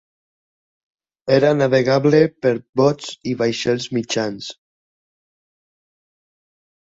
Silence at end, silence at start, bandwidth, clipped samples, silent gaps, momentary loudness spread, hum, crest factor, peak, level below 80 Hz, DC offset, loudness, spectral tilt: 2.4 s; 1.25 s; 8 kHz; under 0.1%; 2.69-2.73 s; 12 LU; none; 18 dB; -2 dBFS; -60 dBFS; under 0.1%; -18 LUFS; -5.5 dB/octave